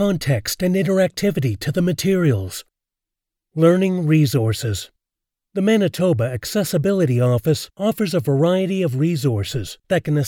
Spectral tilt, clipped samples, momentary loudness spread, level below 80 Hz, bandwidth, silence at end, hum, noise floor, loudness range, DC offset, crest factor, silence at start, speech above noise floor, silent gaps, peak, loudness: -6.5 dB/octave; under 0.1%; 8 LU; -52 dBFS; 18 kHz; 0 s; none; -85 dBFS; 2 LU; under 0.1%; 16 dB; 0 s; 67 dB; none; -4 dBFS; -19 LUFS